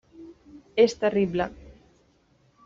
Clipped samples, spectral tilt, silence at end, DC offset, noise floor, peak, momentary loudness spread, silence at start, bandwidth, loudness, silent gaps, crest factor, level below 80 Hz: under 0.1%; -5 dB/octave; 1.1 s; under 0.1%; -63 dBFS; -8 dBFS; 12 LU; 0.2 s; 7.6 kHz; -24 LUFS; none; 20 dB; -56 dBFS